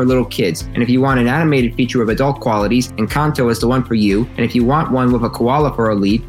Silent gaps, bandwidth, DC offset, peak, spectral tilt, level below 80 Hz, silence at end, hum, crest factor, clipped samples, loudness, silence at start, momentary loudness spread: none; 16 kHz; under 0.1%; -2 dBFS; -6.5 dB/octave; -32 dBFS; 0 s; none; 12 dB; under 0.1%; -15 LUFS; 0 s; 3 LU